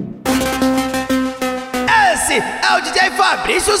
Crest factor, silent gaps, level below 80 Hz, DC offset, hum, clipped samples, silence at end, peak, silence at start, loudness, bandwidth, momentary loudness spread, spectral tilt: 14 dB; none; -40 dBFS; under 0.1%; none; under 0.1%; 0 s; -2 dBFS; 0 s; -15 LUFS; 16.5 kHz; 7 LU; -2.5 dB/octave